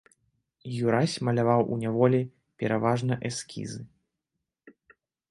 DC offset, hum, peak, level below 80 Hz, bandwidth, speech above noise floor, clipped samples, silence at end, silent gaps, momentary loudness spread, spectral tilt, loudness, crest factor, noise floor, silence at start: under 0.1%; none; -8 dBFS; -66 dBFS; 11.5 kHz; 59 dB; under 0.1%; 0.6 s; none; 14 LU; -6.5 dB/octave; -27 LUFS; 20 dB; -85 dBFS; 0.65 s